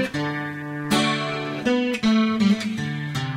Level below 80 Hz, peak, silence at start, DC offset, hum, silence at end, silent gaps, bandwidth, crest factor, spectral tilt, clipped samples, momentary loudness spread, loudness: -56 dBFS; -8 dBFS; 0 s; under 0.1%; none; 0 s; none; 16 kHz; 14 dB; -5.5 dB/octave; under 0.1%; 8 LU; -23 LUFS